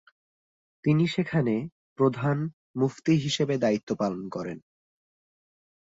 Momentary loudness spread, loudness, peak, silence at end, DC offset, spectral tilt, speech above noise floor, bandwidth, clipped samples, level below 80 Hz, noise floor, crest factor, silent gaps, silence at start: 10 LU; -27 LUFS; -10 dBFS; 1.4 s; under 0.1%; -6.5 dB/octave; over 64 dB; 8 kHz; under 0.1%; -66 dBFS; under -90 dBFS; 18 dB; 1.72-1.96 s, 2.53-2.74 s, 3.83-3.87 s; 0.85 s